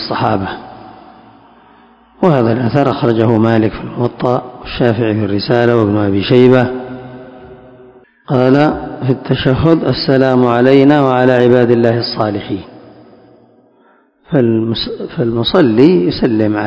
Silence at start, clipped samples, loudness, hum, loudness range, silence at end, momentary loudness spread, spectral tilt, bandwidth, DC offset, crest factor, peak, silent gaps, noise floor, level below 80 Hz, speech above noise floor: 0 s; 0.9%; -12 LUFS; none; 6 LU; 0 s; 11 LU; -8.5 dB/octave; 8 kHz; under 0.1%; 12 dB; 0 dBFS; none; -50 dBFS; -40 dBFS; 39 dB